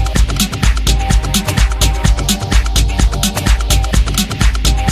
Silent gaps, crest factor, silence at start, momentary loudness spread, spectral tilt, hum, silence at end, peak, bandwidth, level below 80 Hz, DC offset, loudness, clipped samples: none; 12 dB; 0 s; 2 LU; -4 dB/octave; none; 0 s; 0 dBFS; 15.5 kHz; -14 dBFS; under 0.1%; -14 LUFS; under 0.1%